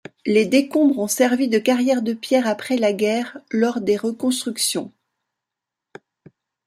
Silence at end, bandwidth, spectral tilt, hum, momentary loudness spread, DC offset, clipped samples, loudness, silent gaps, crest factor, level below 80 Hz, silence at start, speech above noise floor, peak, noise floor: 1.8 s; 15.5 kHz; -3.5 dB/octave; none; 5 LU; under 0.1%; under 0.1%; -20 LUFS; none; 16 dB; -70 dBFS; 0.25 s; 66 dB; -4 dBFS; -85 dBFS